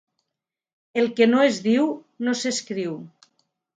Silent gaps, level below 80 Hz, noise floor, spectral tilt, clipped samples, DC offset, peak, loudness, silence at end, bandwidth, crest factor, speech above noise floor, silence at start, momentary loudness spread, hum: none; -74 dBFS; -85 dBFS; -4 dB/octave; under 0.1%; under 0.1%; -6 dBFS; -22 LUFS; 0.7 s; 9.4 kHz; 18 dB; 64 dB; 0.95 s; 12 LU; none